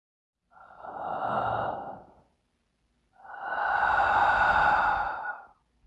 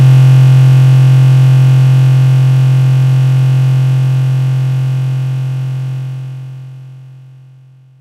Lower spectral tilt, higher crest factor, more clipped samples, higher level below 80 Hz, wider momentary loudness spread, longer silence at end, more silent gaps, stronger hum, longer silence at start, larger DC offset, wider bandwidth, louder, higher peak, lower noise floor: second, -5 dB/octave vs -8 dB/octave; first, 18 dB vs 8 dB; neither; about the same, -54 dBFS vs -50 dBFS; first, 21 LU vs 14 LU; second, 0.4 s vs 0.95 s; neither; neither; first, 0.8 s vs 0 s; neither; first, 8.4 kHz vs 6.8 kHz; second, -26 LUFS vs -9 LUFS; second, -12 dBFS vs 0 dBFS; first, -74 dBFS vs -40 dBFS